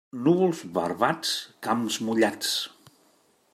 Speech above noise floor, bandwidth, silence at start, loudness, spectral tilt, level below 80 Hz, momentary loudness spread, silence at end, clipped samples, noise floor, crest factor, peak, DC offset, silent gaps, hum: 38 dB; 15.5 kHz; 0.15 s; -26 LUFS; -4 dB/octave; -74 dBFS; 7 LU; 0.85 s; under 0.1%; -64 dBFS; 20 dB; -6 dBFS; under 0.1%; none; none